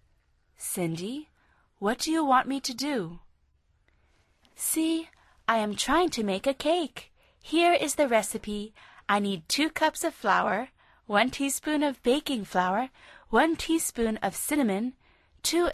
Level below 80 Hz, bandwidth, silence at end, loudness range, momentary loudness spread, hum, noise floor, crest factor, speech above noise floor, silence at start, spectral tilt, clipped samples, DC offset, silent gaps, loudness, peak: -56 dBFS; 13.5 kHz; 0 s; 4 LU; 12 LU; none; -68 dBFS; 20 dB; 41 dB; 0.6 s; -3 dB/octave; under 0.1%; under 0.1%; none; -27 LUFS; -10 dBFS